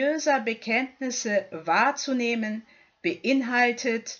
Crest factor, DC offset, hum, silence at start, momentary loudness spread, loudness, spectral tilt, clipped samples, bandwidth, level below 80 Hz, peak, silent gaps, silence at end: 18 dB; under 0.1%; none; 0 s; 8 LU; -25 LUFS; -3 dB/octave; under 0.1%; 7.6 kHz; -78 dBFS; -8 dBFS; none; 0 s